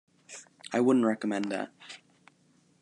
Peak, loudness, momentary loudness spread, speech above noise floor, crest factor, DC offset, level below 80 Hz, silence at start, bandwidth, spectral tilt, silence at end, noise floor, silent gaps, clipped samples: -12 dBFS; -29 LUFS; 23 LU; 38 dB; 20 dB; under 0.1%; -84 dBFS; 0.3 s; 10.5 kHz; -5.5 dB/octave; 0.85 s; -66 dBFS; none; under 0.1%